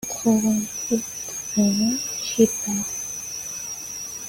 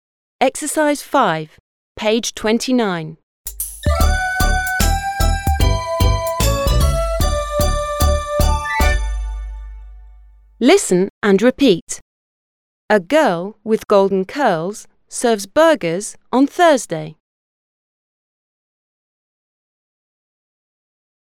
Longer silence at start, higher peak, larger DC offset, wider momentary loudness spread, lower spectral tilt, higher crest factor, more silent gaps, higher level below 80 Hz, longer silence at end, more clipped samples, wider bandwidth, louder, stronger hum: second, 0 s vs 0.4 s; second, -4 dBFS vs 0 dBFS; neither; second, 10 LU vs 14 LU; second, -3.5 dB/octave vs -5 dB/octave; about the same, 20 dB vs 18 dB; second, none vs 1.60-1.95 s, 3.23-3.45 s, 11.10-11.21 s, 11.82-11.87 s, 12.02-12.89 s; second, -58 dBFS vs -24 dBFS; second, 0 s vs 4.2 s; neither; second, 17 kHz vs 19.5 kHz; second, -23 LUFS vs -17 LUFS; neither